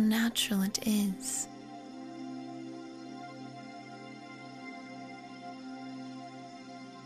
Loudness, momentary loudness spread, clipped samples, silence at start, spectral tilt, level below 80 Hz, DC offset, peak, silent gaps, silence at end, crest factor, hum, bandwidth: -36 LUFS; 17 LU; under 0.1%; 0 s; -3.5 dB/octave; -68 dBFS; under 0.1%; -16 dBFS; none; 0 s; 20 dB; none; 15.5 kHz